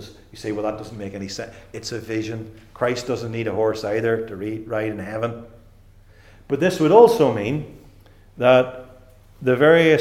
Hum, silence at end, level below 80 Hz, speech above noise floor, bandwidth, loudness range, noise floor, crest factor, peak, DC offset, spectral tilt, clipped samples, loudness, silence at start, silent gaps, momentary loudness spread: none; 0 s; -52 dBFS; 29 dB; 14.5 kHz; 8 LU; -49 dBFS; 22 dB; 0 dBFS; under 0.1%; -6 dB/octave; under 0.1%; -20 LUFS; 0 s; none; 19 LU